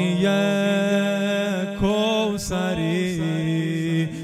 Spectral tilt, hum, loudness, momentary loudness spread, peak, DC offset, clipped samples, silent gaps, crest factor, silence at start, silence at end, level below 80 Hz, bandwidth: -6 dB/octave; none; -22 LUFS; 4 LU; -8 dBFS; under 0.1%; under 0.1%; none; 14 dB; 0 s; 0 s; -46 dBFS; 14 kHz